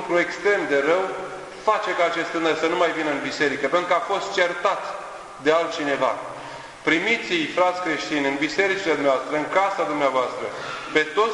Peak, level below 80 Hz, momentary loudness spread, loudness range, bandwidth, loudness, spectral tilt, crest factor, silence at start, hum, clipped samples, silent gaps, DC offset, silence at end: -4 dBFS; -62 dBFS; 10 LU; 2 LU; 11 kHz; -22 LUFS; -3.5 dB/octave; 18 dB; 0 s; none; under 0.1%; none; under 0.1%; 0 s